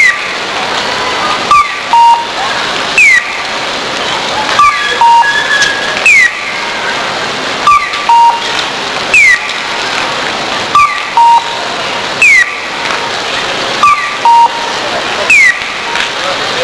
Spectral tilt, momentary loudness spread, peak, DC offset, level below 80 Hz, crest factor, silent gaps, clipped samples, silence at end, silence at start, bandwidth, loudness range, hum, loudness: -1 dB/octave; 10 LU; 0 dBFS; under 0.1%; -44 dBFS; 10 dB; none; 1%; 0 s; 0 s; 11 kHz; 1 LU; none; -8 LUFS